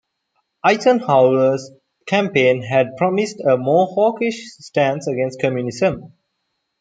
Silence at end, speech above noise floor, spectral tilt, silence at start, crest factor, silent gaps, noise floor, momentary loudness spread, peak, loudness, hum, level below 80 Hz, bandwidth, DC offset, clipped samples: 0.75 s; 56 dB; -6 dB/octave; 0.65 s; 16 dB; none; -73 dBFS; 9 LU; -2 dBFS; -18 LUFS; none; -60 dBFS; 9.2 kHz; under 0.1%; under 0.1%